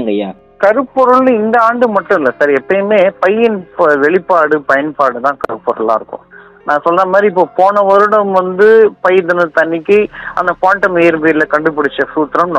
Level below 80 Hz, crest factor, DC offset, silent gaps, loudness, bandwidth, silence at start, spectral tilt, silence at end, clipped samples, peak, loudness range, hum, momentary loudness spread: -52 dBFS; 10 dB; under 0.1%; none; -11 LUFS; 8.4 kHz; 0 s; -7 dB/octave; 0 s; 0.9%; 0 dBFS; 3 LU; none; 8 LU